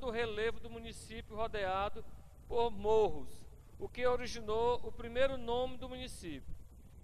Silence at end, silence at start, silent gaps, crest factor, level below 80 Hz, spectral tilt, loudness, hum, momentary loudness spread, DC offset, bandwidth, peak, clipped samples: 0 s; 0 s; none; 16 dB; -52 dBFS; -5 dB/octave; -37 LUFS; none; 18 LU; under 0.1%; 13 kHz; -20 dBFS; under 0.1%